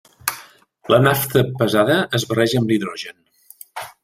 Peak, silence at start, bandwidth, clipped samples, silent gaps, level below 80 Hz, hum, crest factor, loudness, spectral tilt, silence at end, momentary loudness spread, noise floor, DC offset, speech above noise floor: -2 dBFS; 0.25 s; 16.5 kHz; under 0.1%; none; -54 dBFS; none; 18 dB; -18 LUFS; -5 dB/octave; 0.15 s; 18 LU; -45 dBFS; under 0.1%; 28 dB